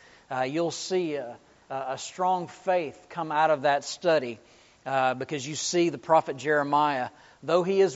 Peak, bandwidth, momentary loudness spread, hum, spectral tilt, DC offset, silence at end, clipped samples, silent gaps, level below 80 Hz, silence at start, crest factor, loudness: -8 dBFS; 8 kHz; 13 LU; none; -3.5 dB/octave; under 0.1%; 0 s; under 0.1%; none; -72 dBFS; 0.3 s; 18 dB; -27 LUFS